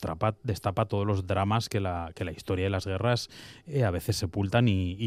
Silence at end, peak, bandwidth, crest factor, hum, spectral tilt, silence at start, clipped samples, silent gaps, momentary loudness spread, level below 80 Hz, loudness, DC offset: 0 s; -10 dBFS; 15 kHz; 18 dB; none; -6 dB/octave; 0 s; under 0.1%; none; 8 LU; -56 dBFS; -29 LUFS; under 0.1%